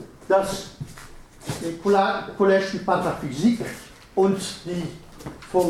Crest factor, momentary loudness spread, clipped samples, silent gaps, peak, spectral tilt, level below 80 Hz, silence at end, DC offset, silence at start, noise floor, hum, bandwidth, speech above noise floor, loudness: 20 dB; 19 LU; under 0.1%; none; -4 dBFS; -5.5 dB/octave; -50 dBFS; 0 s; under 0.1%; 0 s; -43 dBFS; none; 15 kHz; 20 dB; -23 LUFS